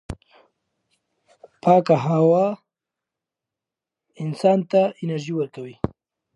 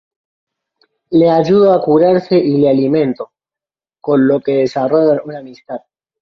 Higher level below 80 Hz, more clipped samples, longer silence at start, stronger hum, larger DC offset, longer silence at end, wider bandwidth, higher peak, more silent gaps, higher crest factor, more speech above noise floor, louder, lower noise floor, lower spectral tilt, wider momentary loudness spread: about the same, -52 dBFS vs -56 dBFS; neither; second, 0.1 s vs 1.1 s; neither; neither; about the same, 0.5 s vs 0.45 s; first, 11.5 kHz vs 6.6 kHz; about the same, -4 dBFS vs -2 dBFS; neither; first, 20 dB vs 12 dB; second, 68 dB vs 77 dB; second, -21 LUFS vs -12 LUFS; about the same, -87 dBFS vs -89 dBFS; about the same, -8 dB/octave vs -8.5 dB/octave; second, 15 LU vs 18 LU